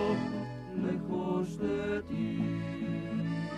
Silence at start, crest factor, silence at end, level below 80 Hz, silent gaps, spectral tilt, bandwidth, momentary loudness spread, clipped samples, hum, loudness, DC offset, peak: 0 s; 14 dB; 0 s; -58 dBFS; none; -8 dB/octave; 11 kHz; 3 LU; under 0.1%; none; -34 LUFS; under 0.1%; -20 dBFS